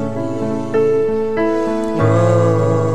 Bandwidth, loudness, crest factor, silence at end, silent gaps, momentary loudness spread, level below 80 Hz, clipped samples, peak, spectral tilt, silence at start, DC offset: 9.8 kHz; -16 LUFS; 12 dB; 0 s; none; 8 LU; -48 dBFS; under 0.1%; -2 dBFS; -8 dB/octave; 0 s; 3%